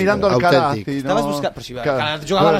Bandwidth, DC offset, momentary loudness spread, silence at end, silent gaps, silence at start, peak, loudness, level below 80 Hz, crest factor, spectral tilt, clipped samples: 15.5 kHz; under 0.1%; 9 LU; 0 s; none; 0 s; -2 dBFS; -18 LUFS; -46 dBFS; 14 dB; -5.5 dB/octave; under 0.1%